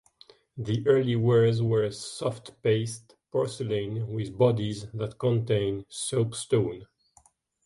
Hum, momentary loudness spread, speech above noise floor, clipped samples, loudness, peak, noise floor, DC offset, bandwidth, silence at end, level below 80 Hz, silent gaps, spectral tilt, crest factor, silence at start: none; 10 LU; 36 dB; under 0.1%; -27 LUFS; -8 dBFS; -63 dBFS; under 0.1%; 11.5 kHz; 0.8 s; -58 dBFS; none; -6.5 dB/octave; 20 dB; 0.55 s